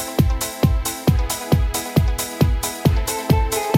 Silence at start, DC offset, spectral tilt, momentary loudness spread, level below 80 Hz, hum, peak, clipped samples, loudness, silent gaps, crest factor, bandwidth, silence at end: 0 s; under 0.1%; -5 dB/octave; 1 LU; -24 dBFS; none; -2 dBFS; under 0.1%; -20 LUFS; none; 16 dB; 17 kHz; 0 s